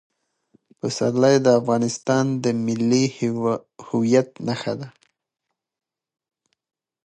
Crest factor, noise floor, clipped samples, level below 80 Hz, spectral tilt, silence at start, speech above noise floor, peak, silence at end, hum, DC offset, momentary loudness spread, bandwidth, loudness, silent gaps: 18 dB; -82 dBFS; under 0.1%; -66 dBFS; -5.5 dB/octave; 0.85 s; 61 dB; -4 dBFS; 2.15 s; none; under 0.1%; 12 LU; 9.2 kHz; -21 LUFS; none